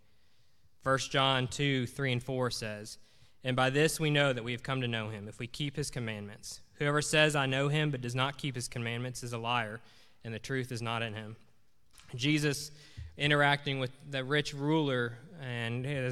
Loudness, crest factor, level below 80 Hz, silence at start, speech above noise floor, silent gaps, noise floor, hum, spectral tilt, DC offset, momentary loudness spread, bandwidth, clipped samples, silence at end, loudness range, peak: -32 LUFS; 22 dB; -60 dBFS; 0.85 s; 38 dB; none; -71 dBFS; none; -4.5 dB/octave; 0.1%; 16 LU; 14.5 kHz; under 0.1%; 0 s; 5 LU; -10 dBFS